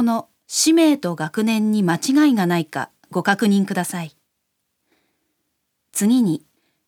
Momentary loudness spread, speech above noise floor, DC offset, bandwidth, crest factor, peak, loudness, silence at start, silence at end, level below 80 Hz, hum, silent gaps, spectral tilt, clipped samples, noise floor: 12 LU; 56 dB; under 0.1%; 19 kHz; 18 dB; -2 dBFS; -19 LUFS; 0 s; 0.5 s; -76 dBFS; none; none; -4.5 dB/octave; under 0.1%; -74 dBFS